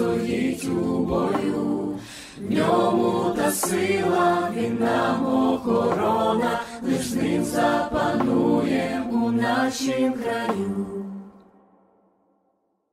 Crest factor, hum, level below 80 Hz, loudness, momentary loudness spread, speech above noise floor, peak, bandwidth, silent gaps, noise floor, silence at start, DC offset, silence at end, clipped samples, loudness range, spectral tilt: 14 dB; none; -52 dBFS; -23 LUFS; 7 LU; 48 dB; -8 dBFS; 15.5 kHz; none; -70 dBFS; 0 s; under 0.1%; 1.6 s; under 0.1%; 4 LU; -5.5 dB/octave